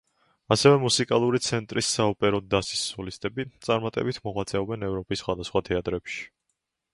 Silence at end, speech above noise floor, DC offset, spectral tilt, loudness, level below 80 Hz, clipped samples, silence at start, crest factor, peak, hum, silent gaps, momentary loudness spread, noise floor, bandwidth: 0.7 s; 54 dB; under 0.1%; -4.5 dB/octave; -26 LUFS; -52 dBFS; under 0.1%; 0.5 s; 24 dB; -4 dBFS; none; none; 12 LU; -79 dBFS; 11.5 kHz